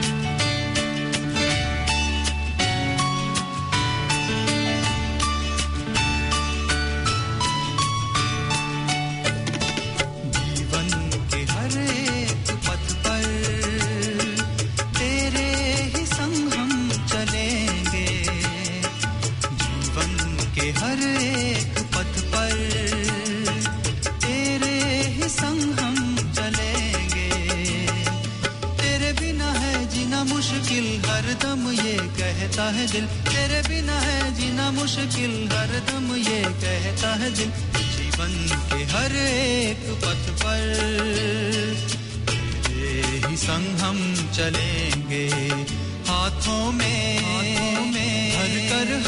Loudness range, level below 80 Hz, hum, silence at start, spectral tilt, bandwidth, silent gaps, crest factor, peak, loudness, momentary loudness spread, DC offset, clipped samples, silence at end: 1 LU; -34 dBFS; none; 0 s; -3.5 dB/octave; 11 kHz; none; 14 dB; -10 dBFS; -23 LUFS; 3 LU; under 0.1%; under 0.1%; 0 s